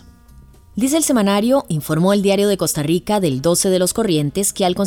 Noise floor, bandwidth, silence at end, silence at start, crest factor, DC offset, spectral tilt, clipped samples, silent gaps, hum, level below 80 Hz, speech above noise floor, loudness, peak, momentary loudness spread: -44 dBFS; over 20 kHz; 0 s; 0.35 s; 14 dB; under 0.1%; -4.5 dB/octave; under 0.1%; none; none; -46 dBFS; 28 dB; -17 LUFS; -4 dBFS; 4 LU